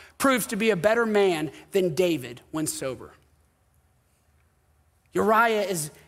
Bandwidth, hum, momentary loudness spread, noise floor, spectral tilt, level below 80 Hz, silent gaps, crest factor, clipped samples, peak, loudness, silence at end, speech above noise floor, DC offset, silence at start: 16 kHz; none; 11 LU; -65 dBFS; -4 dB/octave; -62 dBFS; none; 18 dB; under 0.1%; -8 dBFS; -24 LUFS; 0.15 s; 41 dB; under 0.1%; 0 s